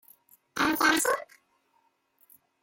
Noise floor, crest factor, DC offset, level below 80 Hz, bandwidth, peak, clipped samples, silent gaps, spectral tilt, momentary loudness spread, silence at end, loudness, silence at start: -71 dBFS; 22 dB; under 0.1%; -66 dBFS; 17 kHz; -10 dBFS; under 0.1%; none; -1.5 dB/octave; 11 LU; 1.4 s; -25 LUFS; 0.55 s